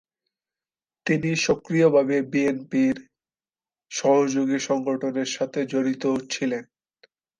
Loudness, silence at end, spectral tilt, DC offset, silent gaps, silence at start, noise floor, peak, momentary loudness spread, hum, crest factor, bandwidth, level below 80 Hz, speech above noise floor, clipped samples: -24 LUFS; 0.75 s; -5 dB/octave; under 0.1%; none; 1.05 s; under -90 dBFS; -8 dBFS; 7 LU; none; 18 dB; 9.8 kHz; -64 dBFS; over 67 dB; under 0.1%